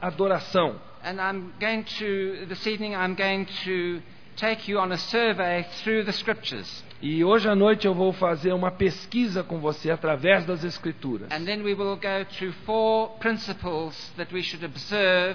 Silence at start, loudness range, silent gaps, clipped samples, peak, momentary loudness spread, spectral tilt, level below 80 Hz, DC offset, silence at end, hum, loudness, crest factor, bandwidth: 0 s; 4 LU; none; under 0.1%; -4 dBFS; 11 LU; -6 dB/octave; -58 dBFS; 0.5%; 0 s; none; -26 LUFS; 20 dB; 5.4 kHz